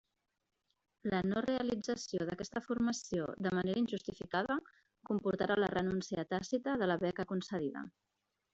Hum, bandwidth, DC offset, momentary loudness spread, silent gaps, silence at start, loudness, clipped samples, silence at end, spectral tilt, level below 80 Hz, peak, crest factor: none; 8 kHz; under 0.1%; 6 LU; none; 1.05 s; -37 LUFS; under 0.1%; 0.65 s; -5.5 dB/octave; -66 dBFS; -20 dBFS; 18 dB